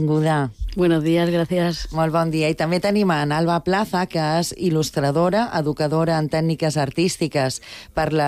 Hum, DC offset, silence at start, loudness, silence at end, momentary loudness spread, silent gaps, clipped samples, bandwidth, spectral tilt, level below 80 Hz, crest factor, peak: none; under 0.1%; 0 s; -20 LUFS; 0 s; 4 LU; none; under 0.1%; 15 kHz; -6 dB/octave; -40 dBFS; 12 dB; -8 dBFS